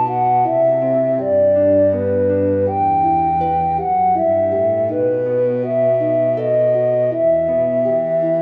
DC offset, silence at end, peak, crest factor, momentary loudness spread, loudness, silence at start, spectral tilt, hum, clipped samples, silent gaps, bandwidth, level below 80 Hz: 0.1%; 0 s; -6 dBFS; 10 dB; 3 LU; -16 LUFS; 0 s; -11 dB/octave; none; under 0.1%; none; 4 kHz; -50 dBFS